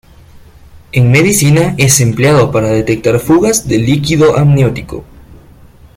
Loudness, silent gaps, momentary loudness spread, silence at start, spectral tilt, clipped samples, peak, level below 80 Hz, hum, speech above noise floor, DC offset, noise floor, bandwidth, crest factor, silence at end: -10 LUFS; none; 6 LU; 0.35 s; -5 dB/octave; under 0.1%; 0 dBFS; -36 dBFS; none; 29 dB; under 0.1%; -38 dBFS; 16.5 kHz; 10 dB; 0.6 s